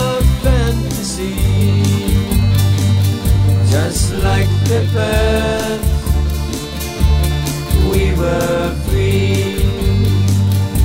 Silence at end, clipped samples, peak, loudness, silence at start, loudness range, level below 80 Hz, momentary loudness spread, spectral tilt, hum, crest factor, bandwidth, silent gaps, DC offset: 0 s; under 0.1%; -2 dBFS; -15 LUFS; 0 s; 2 LU; -20 dBFS; 4 LU; -6 dB/octave; none; 12 dB; 16.5 kHz; none; under 0.1%